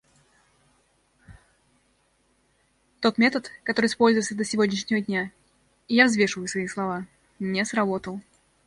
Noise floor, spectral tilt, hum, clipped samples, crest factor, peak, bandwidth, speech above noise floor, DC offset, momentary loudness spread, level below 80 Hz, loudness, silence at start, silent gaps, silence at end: -67 dBFS; -4 dB/octave; none; under 0.1%; 22 dB; -4 dBFS; 11.5 kHz; 43 dB; under 0.1%; 14 LU; -64 dBFS; -24 LUFS; 1.3 s; none; 0.45 s